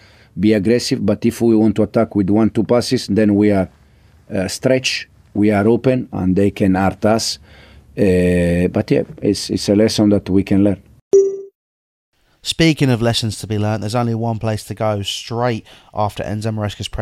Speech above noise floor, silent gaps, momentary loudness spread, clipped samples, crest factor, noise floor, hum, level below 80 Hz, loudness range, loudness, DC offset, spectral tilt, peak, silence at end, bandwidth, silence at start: 33 dB; 11.02-11.11 s, 11.55-12.12 s; 9 LU; under 0.1%; 16 dB; -49 dBFS; none; -46 dBFS; 3 LU; -17 LUFS; under 0.1%; -6 dB/octave; 0 dBFS; 0 s; 15.5 kHz; 0.35 s